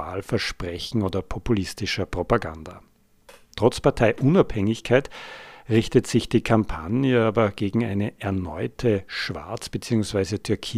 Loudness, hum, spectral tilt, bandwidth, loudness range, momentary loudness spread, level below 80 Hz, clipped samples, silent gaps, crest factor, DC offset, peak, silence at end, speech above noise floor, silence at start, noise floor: -24 LUFS; none; -6 dB/octave; 15 kHz; 5 LU; 11 LU; -42 dBFS; under 0.1%; none; 20 dB; under 0.1%; -2 dBFS; 0 s; 29 dB; 0 s; -52 dBFS